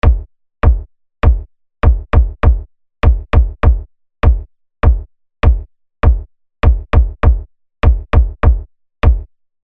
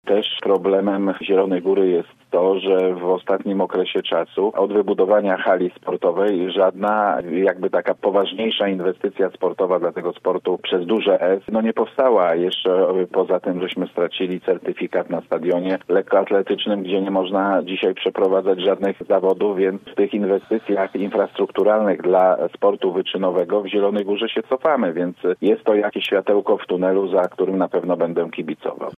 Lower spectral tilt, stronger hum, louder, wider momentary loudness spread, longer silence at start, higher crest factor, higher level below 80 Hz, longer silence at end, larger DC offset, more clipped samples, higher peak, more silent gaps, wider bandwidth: first, -9.5 dB/octave vs -7.5 dB/octave; neither; first, -15 LUFS vs -20 LUFS; first, 9 LU vs 5 LU; about the same, 0.05 s vs 0.05 s; about the same, 12 dB vs 16 dB; first, -14 dBFS vs -68 dBFS; first, 0.4 s vs 0 s; first, 0.9% vs under 0.1%; neither; first, 0 dBFS vs -4 dBFS; neither; about the same, 4.1 kHz vs 4.5 kHz